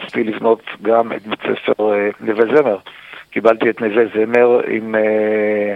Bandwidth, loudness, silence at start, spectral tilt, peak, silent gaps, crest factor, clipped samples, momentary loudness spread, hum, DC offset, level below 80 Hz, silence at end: 5.6 kHz; -16 LUFS; 0 s; -7 dB/octave; 0 dBFS; none; 16 dB; under 0.1%; 9 LU; none; under 0.1%; -64 dBFS; 0 s